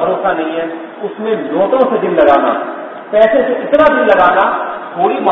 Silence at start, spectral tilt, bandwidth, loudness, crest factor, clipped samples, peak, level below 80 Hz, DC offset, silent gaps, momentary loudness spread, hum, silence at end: 0 s; -7.5 dB/octave; 5.4 kHz; -12 LUFS; 12 dB; 0.2%; 0 dBFS; -48 dBFS; under 0.1%; none; 13 LU; none; 0 s